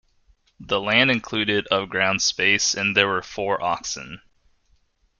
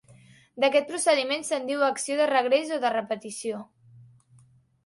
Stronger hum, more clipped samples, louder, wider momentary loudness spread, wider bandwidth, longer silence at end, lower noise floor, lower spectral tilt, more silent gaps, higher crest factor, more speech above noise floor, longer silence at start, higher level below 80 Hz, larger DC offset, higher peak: neither; neither; first, -21 LUFS vs -25 LUFS; about the same, 9 LU vs 10 LU; about the same, 11 kHz vs 11.5 kHz; first, 1.05 s vs 0.85 s; first, -63 dBFS vs -59 dBFS; about the same, -2.5 dB/octave vs -2 dB/octave; neither; about the same, 22 dB vs 18 dB; first, 41 dB vs 34 dB; about the same, 0.6 s vs 0.55 s; first, -56 dBFS vs -76 dBFS; neither; first, -2 dBFS vs -8 dBFS